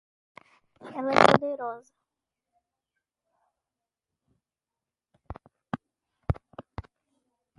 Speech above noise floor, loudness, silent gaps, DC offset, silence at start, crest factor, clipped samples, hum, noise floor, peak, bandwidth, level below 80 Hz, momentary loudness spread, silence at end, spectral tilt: over 66 dB; -25 LUFS; none; under 0.1%; 0.85 s; 32 dB; under 0.1%; none; under -90 dBFS; 0 dBFS; 11.5 kHz; -50 dBFS; 27 LU; 1 s; -5.5 dB/octave